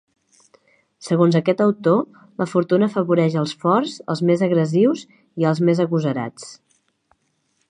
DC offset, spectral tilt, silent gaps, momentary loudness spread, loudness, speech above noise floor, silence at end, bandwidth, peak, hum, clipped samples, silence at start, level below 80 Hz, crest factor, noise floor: under 0.1%; -7.5 dB/octave; none; 13 LU; -19 LUFS; 49 dB; 1.15 s; 10 kHz; -2 dBFS; none; under 0.1%; 1 s; -70 dBFS; 18 dB; -68 dBFS